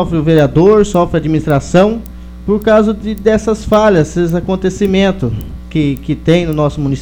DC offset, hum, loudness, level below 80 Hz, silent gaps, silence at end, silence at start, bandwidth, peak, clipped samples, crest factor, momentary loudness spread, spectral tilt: under 0.1%; none; -12 LUFS; -28 dBFS; none; 0 s; 0 s; over 20 kHz; 0 dBFS; 0.2%; 12 dB; 9 LU; -7 dB/octave